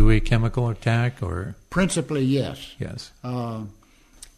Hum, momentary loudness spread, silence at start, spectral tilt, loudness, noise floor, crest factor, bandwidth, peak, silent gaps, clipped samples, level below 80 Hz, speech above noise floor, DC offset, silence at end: none; 12 LU; 0 s; -6 dB/octave; -25 LUFS; -49 dBFS; 18 dB; 13 kHz; -4 dBFS; none; under 0.1%; -28 dBFS; 26 dB; under 0.1%; 0.65 s